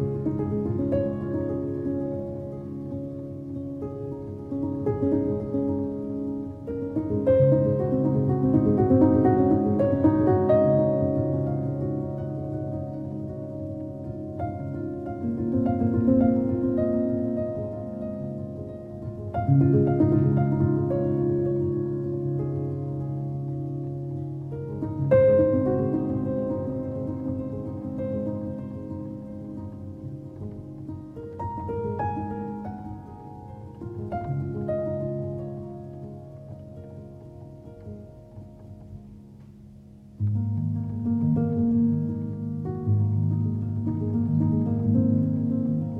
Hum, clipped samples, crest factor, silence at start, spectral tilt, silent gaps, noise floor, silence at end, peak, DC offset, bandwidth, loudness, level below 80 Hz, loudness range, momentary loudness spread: none; under 0.1%; 18 dB; 0 s; -12 dB/octave; none; -47 dBFS; 0 s; -8 dBFS; under 0.1%; 4 kHz; -26 LUFS; -50 dBFS; 13 LU; 18 LU